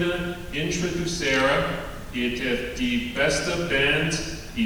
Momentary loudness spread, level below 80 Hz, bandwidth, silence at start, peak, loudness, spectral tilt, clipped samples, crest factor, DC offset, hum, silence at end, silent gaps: 9 LU; -40 dBFS; over 20 kHz; 0 s; -8 dBFS; -24 LUFS; -4 dB/octave; under 0.1%; 16 dB; under 0.1%; none; 0 s; none